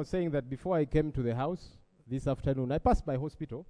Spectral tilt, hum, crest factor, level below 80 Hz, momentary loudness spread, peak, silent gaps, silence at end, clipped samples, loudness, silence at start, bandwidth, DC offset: -8.5 dB/octave; none; 18 dB; -42 dBFS; 7 LU; -14 dBFS; none; 0.05 s; under 0.1%; -32 LUFS; 0 s; 10.5 kHz; under 0.1%